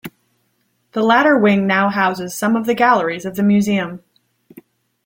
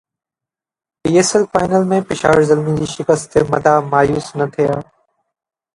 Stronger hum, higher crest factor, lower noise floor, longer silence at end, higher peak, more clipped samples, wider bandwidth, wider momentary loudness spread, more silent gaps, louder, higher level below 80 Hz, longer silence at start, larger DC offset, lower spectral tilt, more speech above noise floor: neither; about the same, 16 dB vs 16 dB; second, -65 dBFS vs -90 dBFS; first, 1.1 s vs 0.95 s; about the same, -2 dBFS vs 0 dBFS; neither; first, 16.5 kHz vs 11.5 kHz; first, 13 LU vs 7 LU; neither; about the same, -16 LUFS vs -15 LUFS; second, -60 dBFS vs -46 dBFS; second, 0.05 s vs 1.05 s; neither; about the same, -5.5 dB/octave vs -5.5 dB/octave; second, 50 dB vs 75 dB